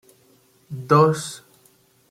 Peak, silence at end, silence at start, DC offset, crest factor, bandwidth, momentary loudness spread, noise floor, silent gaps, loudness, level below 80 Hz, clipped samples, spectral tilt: -2 dBFS; 0.7 s; 0.7 s; under 0.1%; 20 dB; 15.5 kHz; 21 LU; -58 dBFS; none; -18 LUFS; -62 dBFS; under 0.1%; -6 dB/octave